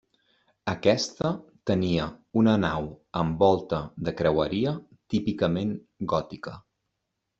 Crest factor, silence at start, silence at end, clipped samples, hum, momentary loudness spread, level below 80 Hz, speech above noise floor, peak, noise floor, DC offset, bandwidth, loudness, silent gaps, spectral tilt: 20 dB; 0.65 s; 0.8 s; under 0.1%; none; 11 LU; -54 dBFS; 55 dB; -6 dBFS; -81 dBFS; under 0.1%; 7.8 kHz; -27 LUFS; none; -6.5 dB/octave